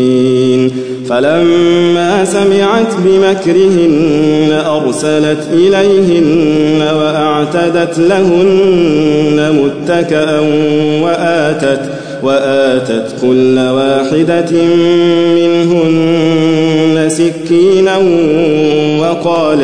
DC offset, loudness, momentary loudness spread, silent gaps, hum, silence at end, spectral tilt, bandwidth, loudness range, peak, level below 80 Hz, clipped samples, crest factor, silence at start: 1%; -10 LUFS; 4 LU; none; none; 0 s; -6 dB/octave; 10.5 kHz; 2 LU; 0 dBFS; -48 dBFS; under 0.1%; 8 dB; 0 s